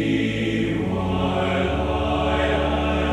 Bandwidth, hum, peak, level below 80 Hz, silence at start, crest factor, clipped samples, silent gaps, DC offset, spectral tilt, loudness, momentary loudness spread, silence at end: 11 kHz; none; -10 dBFS; -32 dBFS; 0 s; 12 dB; under 0.1%; none; under 0.1%; -7 dB/octave; -22 LUFS; 2 LU; 0 s